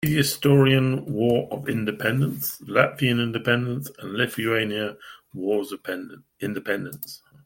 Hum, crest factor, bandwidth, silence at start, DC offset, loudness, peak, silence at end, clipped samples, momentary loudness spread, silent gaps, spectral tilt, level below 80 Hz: none; 20 dB; 17 kHz; 0 s; under 0.1%; -24 LUFS; -4 dBFS; 0.3 s; under 0.1%; 15 LU; none; -5.5 dB/octave; -58 dBFS